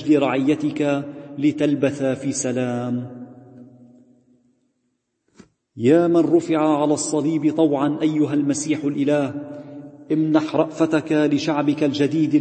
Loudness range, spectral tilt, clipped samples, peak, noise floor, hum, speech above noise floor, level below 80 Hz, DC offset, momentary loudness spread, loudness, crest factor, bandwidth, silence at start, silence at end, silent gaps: 9 LU; -6 dB/octave; under 0.1%; -2 dBFS; -72 dBFS; none; 53 dB; -68 dBFS; under 0.1%; 10 LU; -20 LUFS; 18 dB; 8.8 kHz; 0 s; 0 s; none